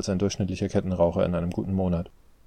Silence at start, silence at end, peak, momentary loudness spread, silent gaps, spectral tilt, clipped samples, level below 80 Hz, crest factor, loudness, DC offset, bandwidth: 0 s; 0.35 s; -8 dBFS; 5 LU; none; -7 dB/octave; under 0.1%; -46 dBFS; 18 dB; -26 LUFS; under 0.1%; 9.8 kHz